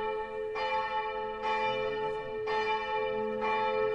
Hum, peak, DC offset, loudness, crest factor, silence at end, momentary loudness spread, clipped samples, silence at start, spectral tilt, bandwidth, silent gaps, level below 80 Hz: none; -20 dBFS; under 0.1%; -32 LUFS; 12 dB; 0 s; 5 LU; under 0.1%; 0 s; -4.5 dB/octave; 8.4 kHz; none; -60 dBFS